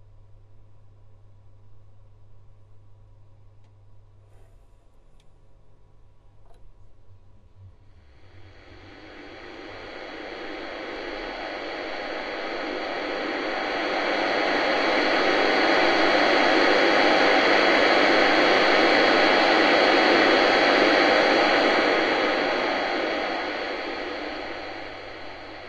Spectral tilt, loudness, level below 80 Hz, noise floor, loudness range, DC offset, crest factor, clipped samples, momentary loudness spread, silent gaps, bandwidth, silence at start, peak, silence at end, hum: -3.5 dB/octave; -21 LUFS; -54 dBFS; -52 dBFS; 18 LU; under 0.1%; 18 dB; under 0.1%; 18 LU; none; 9.4 kHz; 0.5 s; -6 dBFS; 0 s; none